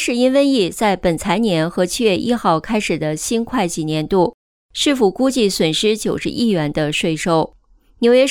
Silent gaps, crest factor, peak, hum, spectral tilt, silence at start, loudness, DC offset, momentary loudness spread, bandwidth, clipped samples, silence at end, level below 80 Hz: 4.34-4.69 s; 14 dB; -2 dBFS; none; -4.5 dB/octave; 0 s; -17 LUFS; under 0.1%; 5 LU; 17.5 kHz; under 0.1%; 0 s; -44 dBFS